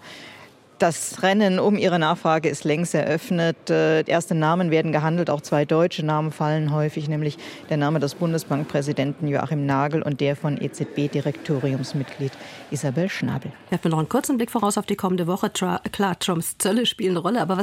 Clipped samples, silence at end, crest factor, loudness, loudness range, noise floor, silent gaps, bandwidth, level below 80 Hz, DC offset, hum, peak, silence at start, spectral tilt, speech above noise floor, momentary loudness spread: under 0.1%; 0 s; 16 dB; -23 LUFS; 5 LU; -47 dBFS; none; 16.5 kHz; -62 dBFS; under 0.1%; none; -6 dBFS; 0 s; -5.5 dB/octave; 25 dB; 8 LU